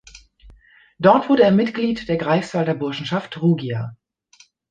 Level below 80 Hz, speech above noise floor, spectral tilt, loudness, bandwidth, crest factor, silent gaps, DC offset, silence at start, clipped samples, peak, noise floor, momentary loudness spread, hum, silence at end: -54 dBFS; 36 dB; -7.5 dB/octave; -19 LUFS; 9 kHz; 20 dB; none; under 0.1%; 0.15 s; under 0.1%; -2 dBFS; -54 dBFS; 11 LU; none; 0.75 s